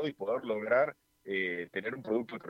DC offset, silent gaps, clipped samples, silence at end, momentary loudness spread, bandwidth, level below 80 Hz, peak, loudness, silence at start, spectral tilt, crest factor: under 0.1%; none; under 0.1%; 0 s; 8 LU; 12.5 kHz; -78 dBFS; -16 dBFS; -33 LUFS; 0 s; -7 dB/octave; 18 dB